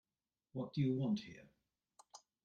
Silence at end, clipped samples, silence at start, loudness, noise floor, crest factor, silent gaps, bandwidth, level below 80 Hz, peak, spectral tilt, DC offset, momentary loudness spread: 0.25 s; under 0.1%; 0.55 s; -40 LUFS; under -90 dBFS; 18 dB; none; 9 kHz; -78 dBFS; -26 dBFS; -7.5 dB/octave; under 0.1%; 24 LU